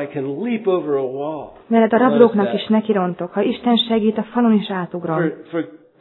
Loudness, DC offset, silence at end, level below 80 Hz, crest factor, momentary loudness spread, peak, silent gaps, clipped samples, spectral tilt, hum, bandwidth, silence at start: -18 LUFS; under 0.1%; 0.25 s; -62 dBFS; 18 dB; 12 LU; 0 dBFS; none; under 0.1%; -9.5 dB/octave; none; 4.2 kHz; 0 s